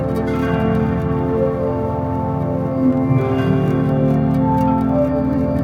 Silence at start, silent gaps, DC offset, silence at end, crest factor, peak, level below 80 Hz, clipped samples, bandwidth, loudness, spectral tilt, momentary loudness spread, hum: 0 s; none; under 0.1%; 0 s; 12 dB; -4 dBFS; -34 dBFS; under 0.1%; 6.8 kHz; -18 LUFS; -10 dB/octave; 4 LU; none